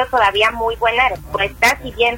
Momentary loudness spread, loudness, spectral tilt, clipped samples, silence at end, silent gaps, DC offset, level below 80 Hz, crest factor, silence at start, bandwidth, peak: 5 LU; -16 LUFS; -2.5 dB/octave; under 0.1%; 0 s; none; under 0.1%; -38 dBFS; 16 dB; 0 s; 16.5 kHz; 0 dBFS